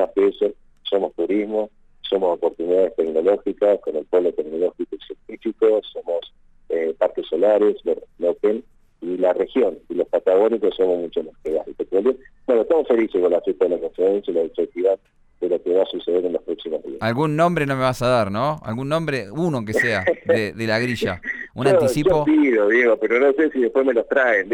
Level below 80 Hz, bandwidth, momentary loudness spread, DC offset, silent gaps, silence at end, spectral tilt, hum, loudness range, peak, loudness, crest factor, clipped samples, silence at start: -52 dBFS; 16 kHz; 10 LU; under 0.1%; none; 0 s; -6.5 dB/octave; none; 4 LU; -6 dBFS; -20 LUFS; 14 dB; under 0.1%; 0 s